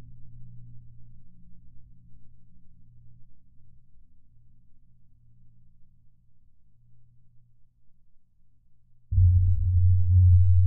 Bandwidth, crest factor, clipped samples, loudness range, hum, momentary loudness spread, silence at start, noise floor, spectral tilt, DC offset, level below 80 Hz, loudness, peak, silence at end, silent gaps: 0.3 kHz; 16 dB; under 0.1%; 30 LU; none; 19 LU; 0.05 s; -55 dBFS; -22 dB/octave; under 0.1%; -38 dBFS; -22 LUFS; -10 dBFS; 0 s; none